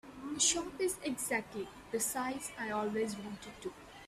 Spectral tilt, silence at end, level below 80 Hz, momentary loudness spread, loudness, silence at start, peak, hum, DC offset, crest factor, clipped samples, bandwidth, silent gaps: -2 dB/octave; 0 s; -66 dBFS; 15 LU; -35 LUFS; 0.05 s; -16 dBFS; none; under 0.1%; 22 dB; under 0.1%; 15.5 kHz; none